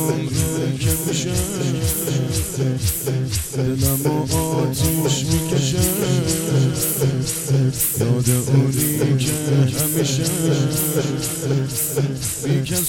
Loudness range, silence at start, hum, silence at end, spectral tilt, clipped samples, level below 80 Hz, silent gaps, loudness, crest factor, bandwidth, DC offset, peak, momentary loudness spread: 3 LU; 0 s; none; 0 s; -5 dB/octave; under 0.1%; -38 dBFS; none; -19 LUFS; 16 dB; 18 kHz; under 0.1%; -4 dBFS; 4 LU